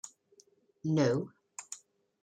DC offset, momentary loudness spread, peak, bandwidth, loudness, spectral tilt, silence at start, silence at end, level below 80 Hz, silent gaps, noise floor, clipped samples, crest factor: under 0.1%; 19 LU; -16 dBFS; 10.5 kHz; -33 LUFS; -6 dB/octave; 0.05 s; 0.45 s; -76 dBFS; none; -66 dBFS; under 0.1%; 20 dB